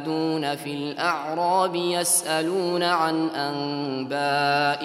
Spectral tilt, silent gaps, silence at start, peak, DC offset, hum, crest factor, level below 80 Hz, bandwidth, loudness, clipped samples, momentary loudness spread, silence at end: -3 dB/octave; none; 0 s; -8 dBFS; under 0.1%; none; 16 dB; -74 dBFS; 16 kHz; -24 LUFS; under 0.1%; 7 LU; 0 s